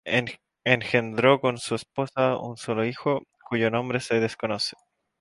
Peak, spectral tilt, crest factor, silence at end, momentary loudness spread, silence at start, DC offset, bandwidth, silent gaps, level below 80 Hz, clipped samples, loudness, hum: -2 dBFS; -5 dB/octave; 24 dB; 0.45 s; 9 LU; 0.05 s; under 0.1%; 11.5 kHz; none; -64 dBFS; under 0.1%; -25 LUFS; none